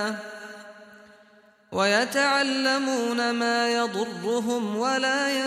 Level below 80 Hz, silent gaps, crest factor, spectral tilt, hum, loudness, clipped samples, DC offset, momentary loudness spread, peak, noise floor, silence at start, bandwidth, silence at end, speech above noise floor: -74 dBFS; none; 18 dB; -3 dB/octave; none; -24 LUFS; under 0.1%; under 0.1%; 14 LU; -8 dBFS; -57 dBFS; 0 s; 15.5 kHz; 0 s; 32 dB